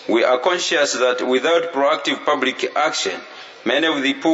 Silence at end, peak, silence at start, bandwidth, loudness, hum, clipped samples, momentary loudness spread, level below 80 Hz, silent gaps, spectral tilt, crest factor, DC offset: 0 s; -2 dBFS; 0 s; 8 kHz; -18 LUFS; none; under 0.1%; 6 LU; -78 dBFS; none; -2 dB/octave; 18 dB; under 0.1%